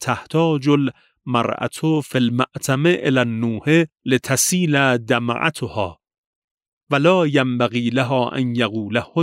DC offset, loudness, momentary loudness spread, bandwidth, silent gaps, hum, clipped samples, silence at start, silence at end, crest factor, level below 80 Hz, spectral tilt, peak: under 0.1%; -19 LUFS; 7 LU; 16 kHz; 6.18-6.58 s, 6.68-6.87 s; none; under 0.1%; 0 s; 0 s; 16 dB; -60 dBFS; -5 dB/octave; -2 dBFS